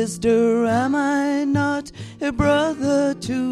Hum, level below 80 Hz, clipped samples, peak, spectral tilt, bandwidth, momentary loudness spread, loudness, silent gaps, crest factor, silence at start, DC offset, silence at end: none; -44 dBFS; under 0.1%; -4 dBFS; -5.5 dB/octave; 12.5 kHz; 8 LU; -20 LUFS; none; 16 dB; 0 s; under 0.1%; 0 s